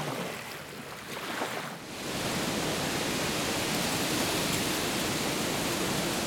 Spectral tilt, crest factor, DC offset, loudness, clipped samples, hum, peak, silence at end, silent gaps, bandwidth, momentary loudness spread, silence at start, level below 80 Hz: -3 dB/octave; 16 dB; under 0.1%; -30 LUFS; under 0.1%; none; -16 dBFS; 0 s; none; 19 kHz; 10 LU; 0 s; -56 dBFS